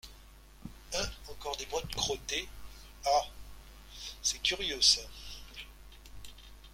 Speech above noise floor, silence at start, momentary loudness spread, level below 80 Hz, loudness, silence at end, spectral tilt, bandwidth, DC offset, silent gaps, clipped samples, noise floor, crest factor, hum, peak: 23 dB; 0.05 s; 26 LU; -52 dBFS; -31 LUFS; 0 s; -1 dB/octave; 16.5 kHz; under 0.1%; none; under 0.1%; -54 dBFS; 26 dB; none; -10 dBFS